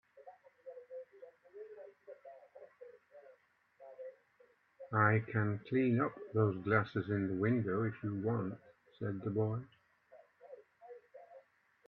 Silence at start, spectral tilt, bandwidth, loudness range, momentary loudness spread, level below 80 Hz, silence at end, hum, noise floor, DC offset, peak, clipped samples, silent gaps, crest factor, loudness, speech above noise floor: 0.15 s; -10.5 dB/octave; 4.5 kHz; 21 LU; 25 LU; -76 dBFS; 0.5 s; none; -70 dBFS; under 0.1%; -14 dBFS; under 0.1%; none; 24 dB; -35 LUFS; 35 dB